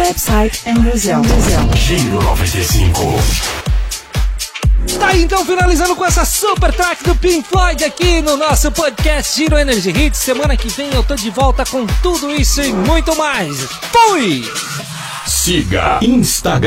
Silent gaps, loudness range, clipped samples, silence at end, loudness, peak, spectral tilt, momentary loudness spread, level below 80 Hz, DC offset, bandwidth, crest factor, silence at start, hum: none; 2 LU; under 0.1%; 0 s; -13 LUFS; 0 dBFS; -4 dB/octave; 6 LU; -18 dBFS; under 0.1%; 16.5 kHz; 12 dB; 0 s; none